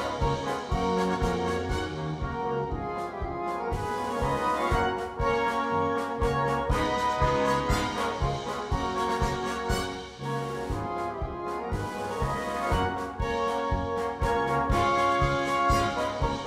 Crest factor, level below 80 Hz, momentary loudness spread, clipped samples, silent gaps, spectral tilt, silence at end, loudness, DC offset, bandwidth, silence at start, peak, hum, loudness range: 16 dB; -38 dBFS; 8 LU; under 0.1%; none; -5.5 dB/octave; 0 s; -28 LUFS; under 0.1%; 16 kHz; 0 s; -12 dBFS; none; 4 LU